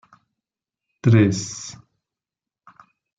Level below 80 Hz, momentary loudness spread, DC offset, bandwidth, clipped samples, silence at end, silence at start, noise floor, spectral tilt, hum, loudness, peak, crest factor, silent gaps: -60 dBFS; 18 LU; under 0.1%; 8 kHz; under 0.1%; 1.5 s; 1.05 s; -89 dBFS; -6.5 dB/octave; none; -19 LUFS; -4 dBFS; 20 dB; none